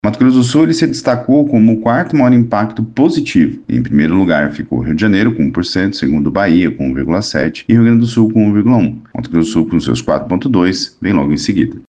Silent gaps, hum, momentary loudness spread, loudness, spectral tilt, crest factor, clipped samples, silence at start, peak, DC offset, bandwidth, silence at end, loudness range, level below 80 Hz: none; none; 6 LU; -12 LUFS; -6.5 dB/octave; 12 dB; under 0.1%; 0.05 s; 0 dBFS; under 0.1%; 9.4 kHz; 0.1 s; 2 LU; -38 dBFS